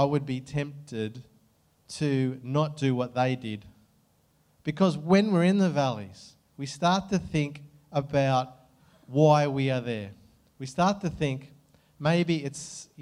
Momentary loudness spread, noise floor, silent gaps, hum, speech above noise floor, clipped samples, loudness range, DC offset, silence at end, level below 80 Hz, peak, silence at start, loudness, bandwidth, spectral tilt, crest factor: 16 LU; -66 dBFS; none; none; 40 dB; under 0.1%; 4 LU; under 0.1%; 0 s; -60 dBFS; -8 dBFS; 0 s; -27 LUFS; 11 kHz; -6.5 dB/octave; 20 dB